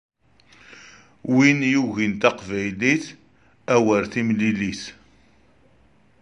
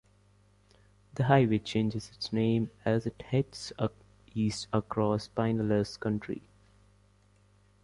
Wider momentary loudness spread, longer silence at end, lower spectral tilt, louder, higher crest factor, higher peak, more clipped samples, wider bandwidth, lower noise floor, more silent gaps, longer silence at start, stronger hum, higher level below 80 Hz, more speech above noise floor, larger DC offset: first, 18 LU vs 11 LU; second, 1.3 s vs 1.45 s; second, -5.5 dB/octave vs -7 dB/octave; first, -21 LUFS vs -31 LUFS; about the same, 20 dB vs 22 dB; first, -2 dBFS vs -10 dBFS; neither; about the same, 10.5 kHz vs 11.5 kHz; second, -58 dBFS vs -64 dBFS; neither; second, 0.75 s vs 1.15 s; second, none vs 50 Hz at -55 dBFS; about the same, -56 dBFS vs -58 dBFS; first, 38 dB vs 34 dB; neither